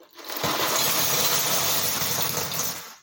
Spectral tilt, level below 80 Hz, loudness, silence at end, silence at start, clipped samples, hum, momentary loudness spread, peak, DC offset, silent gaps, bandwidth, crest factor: -1 dB/octave; -64 dBFS; -22 LUFS; 0.05 s; 0 s; under 0.1%; none; 8 LU; -8 dBFS; under 0.1%; none; 17 kHz; 18 dB